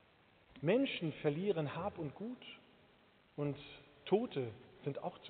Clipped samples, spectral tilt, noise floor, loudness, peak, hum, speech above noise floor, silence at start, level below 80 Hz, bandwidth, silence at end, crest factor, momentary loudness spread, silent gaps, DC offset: under 0.1%; -5.5 dB/octave; -68 dBFS; -39 LUFS; -18 dBFS; none; 30 dB; 0.55 s; -74 dBFS; 4.6 kHz; 0 s; 22 dB; 18 LU; none; under 0.1%